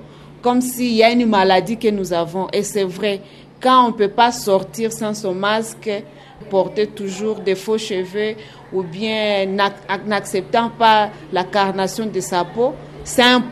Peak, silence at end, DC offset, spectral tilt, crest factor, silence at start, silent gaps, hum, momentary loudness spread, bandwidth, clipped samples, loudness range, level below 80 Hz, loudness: 0 dBFS; 0 s; under 0.1%; -4 dB/octave; 18 dB; 0 s; none; none; 10 LU; 13.5 kHz; under 0.1%; 4 LU; -52 dBFS; -18 LUFS